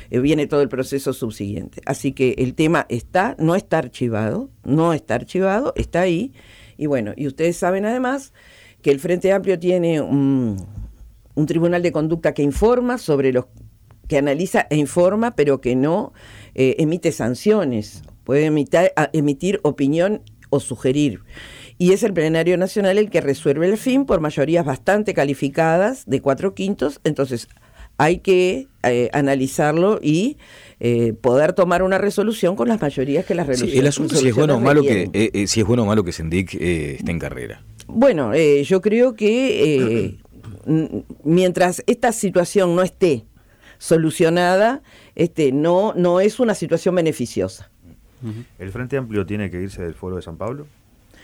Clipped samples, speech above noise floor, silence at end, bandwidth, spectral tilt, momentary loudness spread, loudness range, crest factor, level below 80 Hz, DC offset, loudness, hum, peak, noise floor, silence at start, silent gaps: under 0.1%; 31 dB; 0.6 s; 16.5 kHz; -6 dB/octave; 11 LU; 3 LU; 14 dB; -44 dBFS; under 0.1%; -19 LUFS; none; -6 dBFS; -49 dBFS; 0 s; none